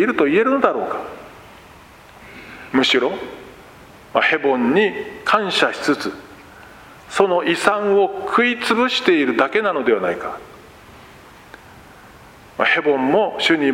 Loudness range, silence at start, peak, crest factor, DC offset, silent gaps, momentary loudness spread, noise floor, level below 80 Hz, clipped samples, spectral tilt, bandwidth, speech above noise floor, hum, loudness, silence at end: 6 LU; 0 s; 0 dBFS; 20 dB; under 0.1%; none; 16 LU; -44 dBFS; -56 dBFS; under 0.1%; -4 dB/octave; 16 kHz; 26 dB; none; -18 LUFS; 0 s